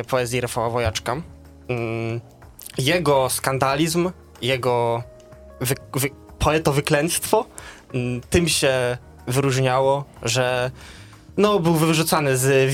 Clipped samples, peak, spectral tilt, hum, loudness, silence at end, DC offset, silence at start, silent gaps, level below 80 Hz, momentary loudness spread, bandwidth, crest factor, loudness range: under 0.1%; -2 dBFS; -4.5 dB/octave; none; -21 LUFS; 0 s; under 0.1%; 0 s; none; -44 dBFS; 12 LU; 18 kHz; 20 dB; 3 LU